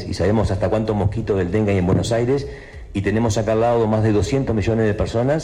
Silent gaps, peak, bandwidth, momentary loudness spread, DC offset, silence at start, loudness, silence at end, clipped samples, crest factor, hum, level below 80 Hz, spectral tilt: none; -8 dBFS; 11 kHz; 4 LU; under 0.1%; 0 s; -19 LUFS; 0 s; under 0.1%; 10 dB; none; -36 dBFS; -7 dB/octave